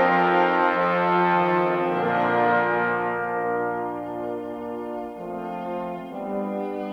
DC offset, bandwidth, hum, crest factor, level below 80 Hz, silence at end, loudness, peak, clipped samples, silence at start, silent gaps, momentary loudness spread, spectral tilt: under 0.1%; 6.6 kHz; none; 16 dB; -62 dBFS; 0 s; -24 LUFS; -8 dBFS; under 0.1%; 0 s; none; 12 LU; -7.5 dB/octave